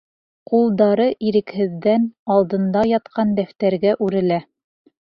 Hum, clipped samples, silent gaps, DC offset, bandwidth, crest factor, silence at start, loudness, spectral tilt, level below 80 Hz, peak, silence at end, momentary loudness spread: none; under 0.1%; 2.19-2.26 s; under 0.1%; 5.6 kHz; 16 dB; 0.5 s; -19 LUFS; -9.5 dB/octave; -58 dBFS; -4 dBFS; 0.65 s; 5 LU